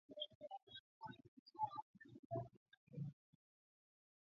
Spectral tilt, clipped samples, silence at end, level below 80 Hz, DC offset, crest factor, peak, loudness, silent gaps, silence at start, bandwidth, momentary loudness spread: -4.5 dB/octave; under 0.1%; 1.2 s; -84 dBFS; under 0.1%; 22 dB; -32 dBFS; -52 LUFS; 0.35-0.40 s, 0.63-0.67 s, 0.80-1.01 s, 1.28-1.46 s, 1.82-1.94 s, 2.19-2.30 s, 2.57-2.66 s, 2.77-2.87 s; 0.1 s; 6.8 kHz; 15 LU